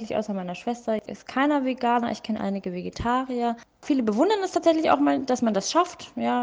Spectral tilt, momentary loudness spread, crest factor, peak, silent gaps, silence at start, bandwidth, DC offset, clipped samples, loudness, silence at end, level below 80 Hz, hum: -5 dB/octave; 9 LU; 18 dB; -6 dBFS; none; 0 s; 9.8 kHz; under 0.1%; under 0.1%; -25 LUFS; 0 s; -54 dBFS; none